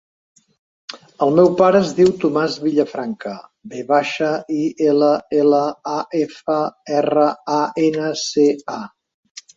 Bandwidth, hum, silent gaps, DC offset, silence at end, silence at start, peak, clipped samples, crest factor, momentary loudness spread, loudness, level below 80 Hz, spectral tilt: 7.8 kHz; none; 9.14-9.23 s, 9.31-9.35 s; under 0.1%; 0.15 s; 0.9 s; -2 dBFS; under 0.1%; 16 dB; 17 LU; -18 LUFS; -60 dBFS; -5.5 dB/octave